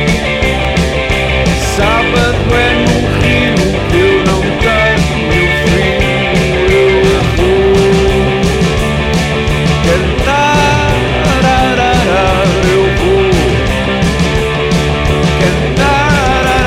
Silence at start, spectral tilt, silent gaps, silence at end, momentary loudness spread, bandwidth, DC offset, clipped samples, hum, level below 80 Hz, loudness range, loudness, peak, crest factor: 0 s; -5.5 dB/octave; none; 0 s; 3 LU; 15.5 kHz; under 0.1%; under 0.1%; none; -18 dBFS; 1 LU; -10 LUFS; -2 dBFS; 8 dB